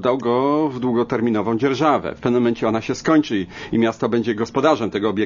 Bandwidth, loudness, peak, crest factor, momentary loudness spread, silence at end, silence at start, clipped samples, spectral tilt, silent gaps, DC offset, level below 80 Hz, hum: 7.4 kHz; -19 LUFS; -2 dBFS; 16 dB; 4 LU; 0 s; 0 s; under 0.1%; -6.5 dB/octave; none; under 0.1%; -52 dBFS; none